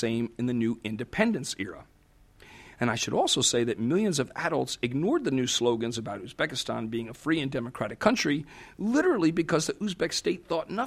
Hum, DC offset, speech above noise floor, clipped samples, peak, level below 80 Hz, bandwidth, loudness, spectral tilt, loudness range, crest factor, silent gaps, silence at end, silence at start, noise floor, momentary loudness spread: none; under 0.1%; 31 dB; under 0.1%; -6 dBFS; -60 dBFS; 15 kHz; -28 LUFS; -4 dB/octave; 3 LU; 22 dB; none; 0 s; 0 s; -59 dBFS; 9 LU